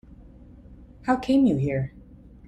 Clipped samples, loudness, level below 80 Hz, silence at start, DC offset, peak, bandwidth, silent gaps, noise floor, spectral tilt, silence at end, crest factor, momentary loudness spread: under 0.1%; -24 LUFS; -48 dBFS; 0.1 s; under 0.1%; -10 dBFS; 8.8 kHz; none; -48 dBFS; -8 dB/octave; 0.5 s; 16 dB; 14 LU